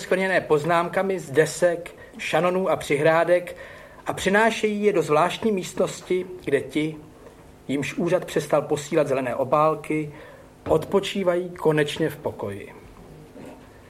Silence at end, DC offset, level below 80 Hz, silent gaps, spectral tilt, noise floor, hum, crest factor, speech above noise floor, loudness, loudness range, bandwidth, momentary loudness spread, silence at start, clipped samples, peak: 0.1 s; under 0.1%; -54 dBFS; none; -5 dB/octave; -47 dBFS; none; 18 dB; 24 dB; -23 LUFS; 4 LU; 15.5 kHz; 17 LU; 0 s; under 0.1%; -6 dBFS